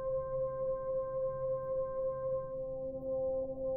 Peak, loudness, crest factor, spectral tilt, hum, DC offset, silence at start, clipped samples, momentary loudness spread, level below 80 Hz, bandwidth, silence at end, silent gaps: -28 dBFS; -37 LUFS; 8 dB; -12 dB/octave; none; under 0.1%; 0 s; under 0.1%; 4 LU; -56 dBFS; 2.2 kHz; 0 s; none